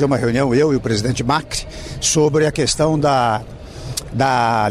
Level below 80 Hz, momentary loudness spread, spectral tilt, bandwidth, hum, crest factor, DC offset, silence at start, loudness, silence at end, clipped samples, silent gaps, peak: -38 dBFS; 11 LU; -4.5 dB/octave; 15 kHz; none; 12 dB; under 0.1%; 0 s; -17 LUFS; 0 s; under 0.1%; none; -6 dBFS